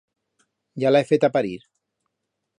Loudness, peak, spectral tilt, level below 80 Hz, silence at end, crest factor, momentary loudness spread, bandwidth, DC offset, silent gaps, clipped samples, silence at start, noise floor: -21 LUFS; -6 dBFS; -7 dB/octave; -68 dBFS; 1 s; 18 dB; 20 LU; 10.5 kHz; under 0.1%; none; under 0.1%; 0.75 s; -80 dBFS